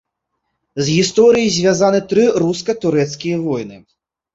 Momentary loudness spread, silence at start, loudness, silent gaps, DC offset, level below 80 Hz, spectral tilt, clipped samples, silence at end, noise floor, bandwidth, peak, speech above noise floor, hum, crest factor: 10 LU; 0.75 s; -15 LUFS; none; under 0.1%; -52 dBFS; -5 dB/octave; under 0.1%; 0.55 s; -74 dBFS; 8 kHz; -2 dBFS; 59 dB; none; 14 dB